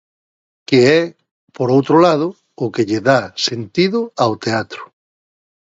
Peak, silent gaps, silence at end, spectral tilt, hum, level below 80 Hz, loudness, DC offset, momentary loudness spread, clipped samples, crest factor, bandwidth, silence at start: 0 dBFS; 1.31-1.47 s; 0.75 s; -5.5 dB/octave; none; -58 dBFS; -16 LUFS; under 0.1%; 13 LU; under 0.1%; 16 dB; 7.8 kHz; 0.7 s